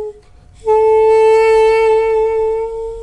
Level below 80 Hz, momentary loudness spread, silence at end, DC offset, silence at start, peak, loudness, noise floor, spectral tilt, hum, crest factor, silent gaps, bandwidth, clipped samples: -40 dBFS; 12 LU; 0 s; under 0.1%; 0 s; -4 dBFS; -12 LUFS; -41 dBFS; -3.5 dB/octave; none; 10 dB; none; 11 kHz; under 0.1%